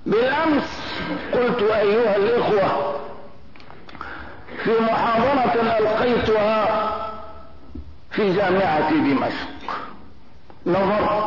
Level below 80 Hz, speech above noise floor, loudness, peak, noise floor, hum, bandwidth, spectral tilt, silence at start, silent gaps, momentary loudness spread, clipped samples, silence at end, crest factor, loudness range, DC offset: -48 dBFS; 29 dB; -20 LUFS; -10 dBFS; -48 dBFS; none; 6 kHz; -7 dB/octave; 0.05 s; none; 18 LU; under 0.1%; 0 s; 12 dB; 3 LU; 1%